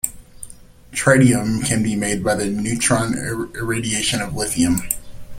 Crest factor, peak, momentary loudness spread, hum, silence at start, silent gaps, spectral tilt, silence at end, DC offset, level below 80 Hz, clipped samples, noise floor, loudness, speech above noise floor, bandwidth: 20 dB; 0 dBFS; 12 LU; none; 0.05 s; none; -4 dB/octave; 0 s; under 0.1%; -40 dBFS; under 0.1%; -39 dBFS; -19 LUFS; 20 dB; 16.5 kHz